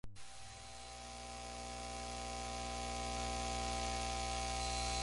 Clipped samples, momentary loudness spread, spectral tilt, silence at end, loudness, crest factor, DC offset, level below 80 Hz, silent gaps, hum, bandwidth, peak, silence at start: under 0.1%; 12 LU; -3 dB/octave; 0 s; -42 LUFS; 16 dB; under 0.1%; -50 dBFS; none; 60 Hz at -50 dBFS; 11.5 kHz; -26 dBFS; 0.05 s